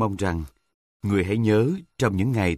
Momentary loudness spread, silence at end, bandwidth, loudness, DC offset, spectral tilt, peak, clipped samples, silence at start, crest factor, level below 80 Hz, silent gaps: 12 LU; 0 s; 14.5 kHz; -24 LUFS; under 0.1%; -7 dB/octave; -6 dBFS; under 0.1%; 0 s; 18 dB; -44 dBFS; 0.74-1.00 s